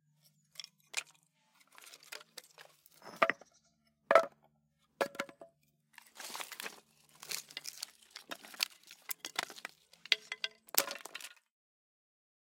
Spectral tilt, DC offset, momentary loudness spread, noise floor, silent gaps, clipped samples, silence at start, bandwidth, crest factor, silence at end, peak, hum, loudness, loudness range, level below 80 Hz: 0 dB/octave; under 0.1%; 21 LU; -76 dBFS; none; under 0.1%; 0.6 s; 17 kHz; 38 dB; 1.3 s; -4 dBFS; none; -37 LUFS; 9 LU; -90 dBFS